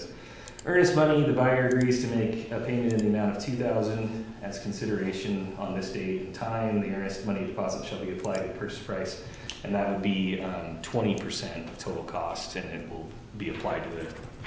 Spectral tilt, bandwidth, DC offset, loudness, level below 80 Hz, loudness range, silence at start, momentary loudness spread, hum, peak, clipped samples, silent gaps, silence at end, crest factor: -6 dB/octave; 8 kHz; under 0.1%; -29 LUFS; -52 dBFS; 8 LU; 0 s; 14 LU; none; -10 dBFS; under 0.1%; none; 0 s; 18 dB